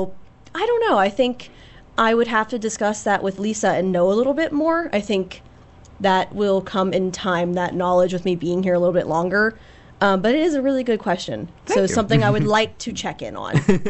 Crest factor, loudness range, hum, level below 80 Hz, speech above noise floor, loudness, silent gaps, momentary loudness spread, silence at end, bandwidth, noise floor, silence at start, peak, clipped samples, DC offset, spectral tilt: 16 dB; 2 LU; none; -48 dBFS; 26 dB; -20 LUFS; none; 8 LU; 0 s; 8.4 kHz; -45 dBFS; 0 s; -4 dBFS; under 0.1%; under 0.1%; -5.5 dB/octave